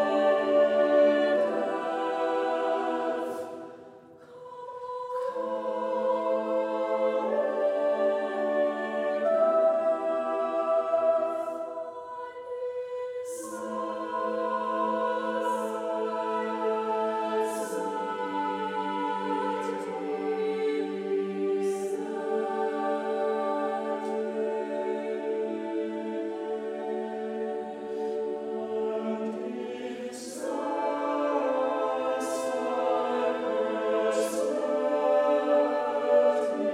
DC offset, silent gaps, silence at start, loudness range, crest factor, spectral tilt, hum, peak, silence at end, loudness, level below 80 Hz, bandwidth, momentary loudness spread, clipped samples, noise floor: under 0.1%; none; 0 s; 6 LU; 16 dB; -4.5 dB/octave; none; -12 dBFS; 0 s; -29 LUFS; -80 dBFS; 14.5 kHz; 11 LU; under 0.1%; -50 dBFS